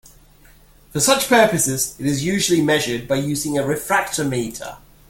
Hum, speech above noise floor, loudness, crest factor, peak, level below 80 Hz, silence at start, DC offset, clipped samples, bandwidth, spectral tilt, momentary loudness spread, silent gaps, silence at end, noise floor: none; 30 dB; -18 LUFS; 18 dB; -2 dBFS; -48 dBFS; 0.95 s; under 0.1%; under 0.1%; 17 kHz; -3.5 dB/octave; 11 LU; none; 0.3 s; -49 dBFS